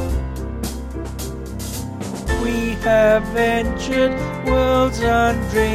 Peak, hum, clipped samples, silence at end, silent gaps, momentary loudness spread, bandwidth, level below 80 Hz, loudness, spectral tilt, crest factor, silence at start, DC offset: -4 dBFS; none; under 0.1%; 0 s; none; 13 LU; 15.5 kHz; -28 dBFS; -20 LUFS; -5.5 dB/octave; 14 dB; 0 s; under 0.1%